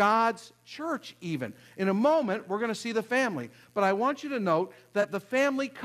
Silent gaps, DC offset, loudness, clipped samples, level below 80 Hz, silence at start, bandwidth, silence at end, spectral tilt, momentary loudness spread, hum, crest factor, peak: none; under 0.1%; -29 LUFS; under 0.1%; -78 dBFS; 0 s; 14 kHz; 0 s; -5.5 dB/octave; 11 LU; none; 18 dB; -12 dBFS